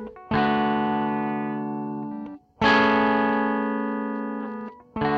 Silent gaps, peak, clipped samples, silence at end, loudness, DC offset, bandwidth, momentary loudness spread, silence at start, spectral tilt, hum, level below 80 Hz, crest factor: none; -8 dBFS; under 0.1%; 0 s; -24 LUFS; under 0.1%; 7.2 kHz; 15 LU; 0 s; -6.5 dB/octave; none; -54 dBFS; 16 dB